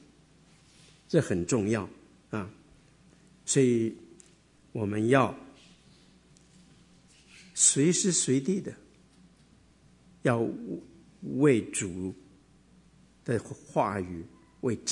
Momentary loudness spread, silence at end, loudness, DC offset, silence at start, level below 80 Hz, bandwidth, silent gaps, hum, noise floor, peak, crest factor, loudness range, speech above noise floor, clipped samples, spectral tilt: 19 LU; 0 s; -28 LUFS; under 0.1%; 1.1 s; -66 dBFS; 11 kHz; none; none; -60 dBFS; -8 dBFS; 24 dB; 5 LU; 33 dB; under 0.1%; -4.5 dB/octave